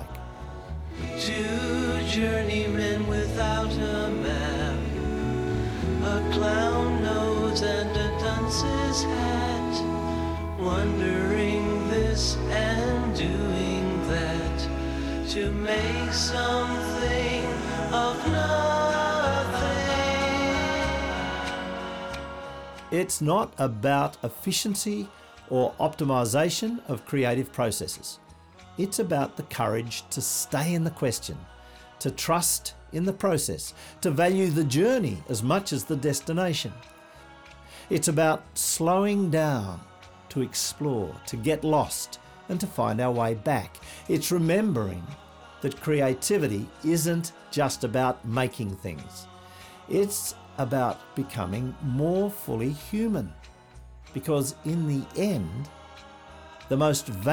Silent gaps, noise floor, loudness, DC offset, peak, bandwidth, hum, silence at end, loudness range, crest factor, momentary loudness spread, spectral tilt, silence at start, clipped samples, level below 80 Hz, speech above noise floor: none; -50 dBFS; -27 LUFS; under 0.1%; -12 dBFS; over 20 kHz; none; 0 s; 4 LU; 16 dB; 11 LU; -4.5 dB/octave; 0 s; under 0.1%; -40 dBFS; 24 dB